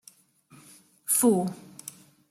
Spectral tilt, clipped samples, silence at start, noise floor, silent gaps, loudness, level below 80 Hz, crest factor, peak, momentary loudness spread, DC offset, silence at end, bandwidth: -5 dB/octave; under 0.1%; 1.1 s; -58 dBFS; none; -24 LUFS; -76 dBFS; 20 dB; -10 dBFS; 21 LU; under 0.1%; 0.4 s; 16 kHz